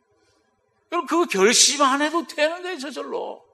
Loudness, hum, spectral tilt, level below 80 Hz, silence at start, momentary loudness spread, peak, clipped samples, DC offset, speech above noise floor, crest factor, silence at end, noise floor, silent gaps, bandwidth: -20 LUFS; none; -1 dB/octave; -82 dBFS; 0.9 s; 16 LU; -2 dBFS; under 0.1%; under 0.1%; 46 dB; 20 dB; 0.2 s; -67 dBFS; none; 15 kHz